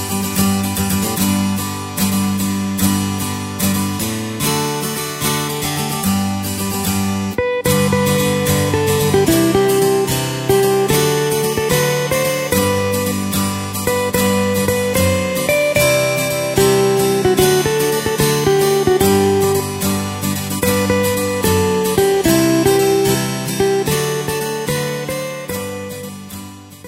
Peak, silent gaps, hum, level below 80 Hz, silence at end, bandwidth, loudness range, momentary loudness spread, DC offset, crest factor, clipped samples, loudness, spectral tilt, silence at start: 0 dBFS; none; none; -40 dBFS; 0 s; 16.5 kHz; 4 LU; 7 LU; under 0.1%; 16 dB; under 0.1%; -16 LUFS; -4.5 dB/octave; 0 s